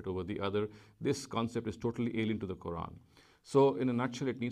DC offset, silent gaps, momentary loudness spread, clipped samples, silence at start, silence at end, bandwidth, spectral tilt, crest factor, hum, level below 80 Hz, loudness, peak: under 0.1%; none; 12 LU; under 0.1%; 0 s; 0 s; 12 kHz; -6.5 dB/octave; 18 dB; none; -62 dBFS; -34 LUFS; -16 dBFS